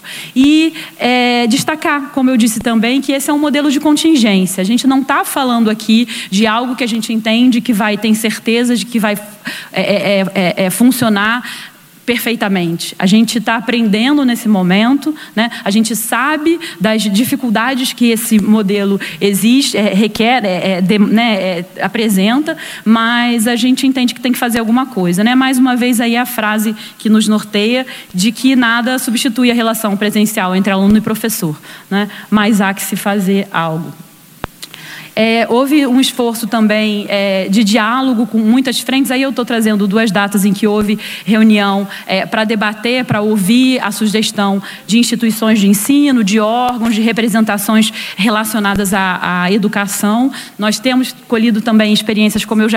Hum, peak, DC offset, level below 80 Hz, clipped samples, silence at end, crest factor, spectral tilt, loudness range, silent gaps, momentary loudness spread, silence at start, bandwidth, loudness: none; 0 dBFS; under 0.1%; -50 dBFS; under 0.1%; 0 s; 12 dB; -4.5 dB/octave; 2 LU; none; 6 LU; 0.05 s; 16.5 kHz; -12 LUFS